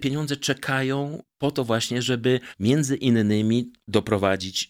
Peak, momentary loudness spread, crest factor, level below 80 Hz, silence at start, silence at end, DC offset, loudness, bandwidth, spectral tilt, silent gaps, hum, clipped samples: -6 dBFS; 5 LU; 18 dB; -58 dBFS; 0 s; 0.05 s; under 0.1%; -24 LUFS; 16.5 kHz; -5 dB/octave; none; none; under 0.1%